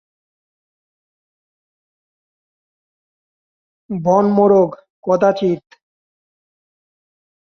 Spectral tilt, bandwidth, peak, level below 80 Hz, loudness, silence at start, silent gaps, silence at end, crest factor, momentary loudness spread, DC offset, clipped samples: -8 dB/octave; 6.6 kHz; -2 dBFS; -64 dBFS; -15 LUFS; 3.9 s; 4.90-5.03 s; 1.95 s; 20 dB; 14 LU; under 0.1%; under 0.1%